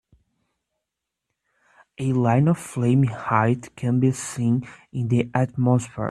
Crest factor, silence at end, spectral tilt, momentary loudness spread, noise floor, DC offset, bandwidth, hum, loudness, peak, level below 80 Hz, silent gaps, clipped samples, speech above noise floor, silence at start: 20 dB; 0 s; -7.5 dB/octave; 6 LU; -83 dBFS; under 0.1%; 12.5 kHz; none; -22 LUFS; -2 dBFS; -58 dBFS; none; under 0.1%; 62 dB; 2 s